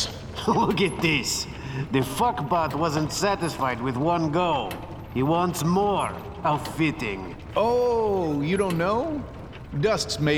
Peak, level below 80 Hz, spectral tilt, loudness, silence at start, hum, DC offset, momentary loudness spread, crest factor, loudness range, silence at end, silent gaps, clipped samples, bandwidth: -8 dBFS; -46 dBFS; -5 dB/octave; -25 LUFS; 0 s; none; under 0.1%; 9 LU; 16 dB; 1 LU; 0 s; none; under 0.1%; 19 kHz